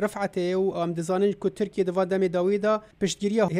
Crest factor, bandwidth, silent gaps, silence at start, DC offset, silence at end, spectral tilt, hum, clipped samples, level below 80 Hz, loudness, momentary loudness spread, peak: 14 dB; 14.5 kHz; none; 0 s; under 0.1%; 0 s; -6 dB/octave; none; under 0.1%; -60 dBFS; -26 LUFS; 4 LU; -12 dBFS